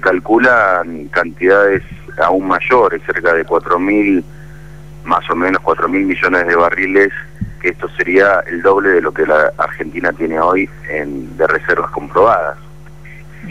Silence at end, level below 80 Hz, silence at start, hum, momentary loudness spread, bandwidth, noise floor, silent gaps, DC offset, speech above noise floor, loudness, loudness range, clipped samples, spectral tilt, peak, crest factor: 0 s; -40 dBFS; 0 s; none; 9 LU; 12 kHz; -36 dBFS; none; 1%; 22 dB; -13 LUFS; 3 LU; under 0.1%; -7 dB/octave; 0 dBFS; 12 dB